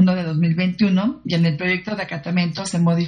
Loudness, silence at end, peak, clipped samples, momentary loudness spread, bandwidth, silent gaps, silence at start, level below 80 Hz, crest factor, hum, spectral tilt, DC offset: -20 LUFS; 0 s; -4 dBFS; under 0.1%; 5 LU; 10 kHz; none; 0 s; -54 dBFS; 14 dB; none; -6.5 dB/octave; under 0.1%